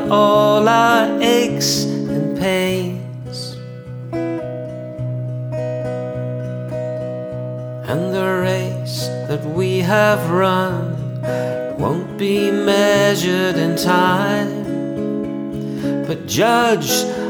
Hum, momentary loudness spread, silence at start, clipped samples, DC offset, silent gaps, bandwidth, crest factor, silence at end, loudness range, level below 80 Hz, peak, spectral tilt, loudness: none; 13 LU; 0 s; under 0.1%; under 0.1%; none; over 20 kHz; 16 dB; 0 s; 8 LU; -50 dBFS; 0 dBFS; -5 dB/octave; -18 LUFS